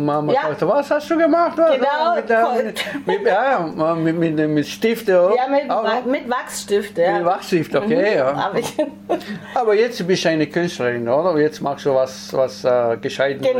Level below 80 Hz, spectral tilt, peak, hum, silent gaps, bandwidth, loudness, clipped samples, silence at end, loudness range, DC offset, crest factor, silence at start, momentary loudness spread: -62 dBFS; -5.5 dB/octave; -6 dBFS; none; none; 16.5 kHz; -18 LUFS; under 0.1%; 0 s; 2 LU; under 0.1%; 12 dB; 0 s; 6 LU